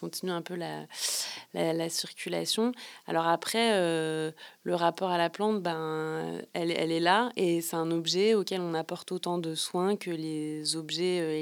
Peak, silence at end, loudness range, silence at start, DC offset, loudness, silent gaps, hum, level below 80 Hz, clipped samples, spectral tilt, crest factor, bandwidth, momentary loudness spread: -8 dBFS; 0 s; 2 LU; 0 s; under 0.1%; -30 LUFS; none; none; under -90 dBFS; under 0.1%; -4 dB/octave; 22 dB; 19.5 kHz; 9 LU